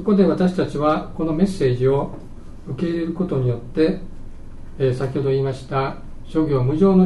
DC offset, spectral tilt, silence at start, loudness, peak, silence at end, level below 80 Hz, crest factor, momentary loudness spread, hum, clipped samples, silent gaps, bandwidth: under 0.1%; -8.5 dB/octave; 0 s; -21 LUFS; -4 dBFS; 0 s; -36 dBFS; 16 dB; 15 LU; none; under 0.1%; none; 11.5 kHz